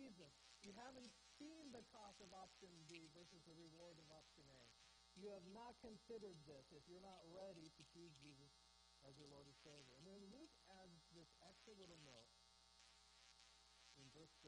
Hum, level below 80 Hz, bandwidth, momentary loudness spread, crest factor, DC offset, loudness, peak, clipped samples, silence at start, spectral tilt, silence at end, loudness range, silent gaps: none; -84 dBFS; 10 kHz; 9 LU; 18 dB; under 0.1%; -64 LUFS; -46 dBFS; under 0.1%; 0 s; -4 dB/octave; 0 s; 5 LU; none